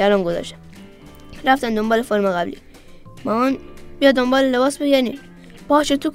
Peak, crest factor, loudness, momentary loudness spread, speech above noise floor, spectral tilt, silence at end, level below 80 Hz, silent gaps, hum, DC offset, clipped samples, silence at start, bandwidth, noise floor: 0 dBFS; 18 dB; -19 LUFS; 12 LU; 23 dB; -4.5 dB/octave; 0 s; -44 dBFS; none; none; under 0.1%; under 0.1%; 0 s; 16 kHz; -41 dBFS